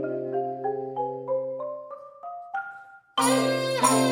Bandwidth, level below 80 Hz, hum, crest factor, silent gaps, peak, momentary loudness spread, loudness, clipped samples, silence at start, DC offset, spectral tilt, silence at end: 16 kHz; -76 dBFS; none; 22 dB; none; -6 dBFS; 18 LU; -27 LUFS; under 0.1%; 0 s; under 0.1%; -3.5 dB/octave; 0 s